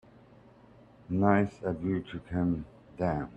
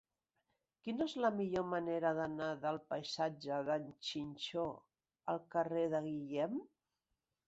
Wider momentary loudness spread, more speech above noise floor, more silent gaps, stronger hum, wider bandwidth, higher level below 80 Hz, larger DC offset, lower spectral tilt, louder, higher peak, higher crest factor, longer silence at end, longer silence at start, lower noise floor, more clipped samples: first, 10 LU vs 7 LU; second, 27 dB vs 50 dB; neither; neither; about the same, 8.2 kHz vs 8 kHz; first, -56 dBFS vs -76 dBFS; neither; first, -9.5 dB/octave vs -4 dB/octave; first, -31 LUFS vs -40 LUFS; first, -8 dBFS vs -22 dBFS; first, 24 dB vs 18 dB; second, 0 s vs 0.8 s; first, 1.1 s vs 0.85 s; second, -57 dBFS vs -89 dBFS; neither